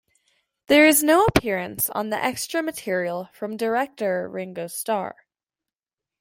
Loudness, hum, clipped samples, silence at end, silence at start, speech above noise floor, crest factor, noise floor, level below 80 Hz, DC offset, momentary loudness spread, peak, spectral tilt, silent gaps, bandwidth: -22 LUFS; none; under 0.1%; 1.1 s; 0.7 s; 68 dB; 22 dB; -90 dBFS; -50 dBFS; under 0.1%; 16 LU; -2 dBFS; -3.5 dB/octave; none; 16.5 kHz